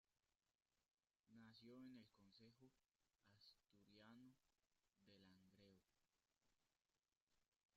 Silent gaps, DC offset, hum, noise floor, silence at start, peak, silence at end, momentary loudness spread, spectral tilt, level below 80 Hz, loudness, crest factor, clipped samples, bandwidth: 1.20-1.24 s, 7.22-7.27 s, 7.48-7.52 s, 7.65-7.69 s; under 0.1%; none; under -90 dBFS; 0.1 s; -54 dBFS; 0 s; 5 LU; -4.5 dB/octave; under -90 dBFS; -66 LUFS; 18 dB; under 0.1%; 7.2 kHz